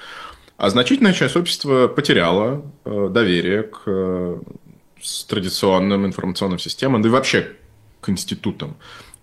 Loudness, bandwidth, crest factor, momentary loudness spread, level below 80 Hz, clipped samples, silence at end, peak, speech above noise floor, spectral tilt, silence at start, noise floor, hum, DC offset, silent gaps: -19 LUFS; 13 kHz; 18 dB; 16 LU; -54 dBFS; under 0.1%; 0.2 s; -2 dBFS; 19 dB; -5 dB/octave; 0 s; -38 dBFS; none; under 0.1%; none